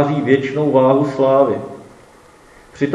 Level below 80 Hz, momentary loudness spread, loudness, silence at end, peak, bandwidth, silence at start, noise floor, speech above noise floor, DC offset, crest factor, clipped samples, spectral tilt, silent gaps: -56 dBFS; 11 LU; -15 LUFS; 0 s; 0 dBFS; 10.5 kHz; 0 s; -45 dBFS; 31 dB; under 0.1%; 16 dB; under 0.1%; -8 dB/octave; none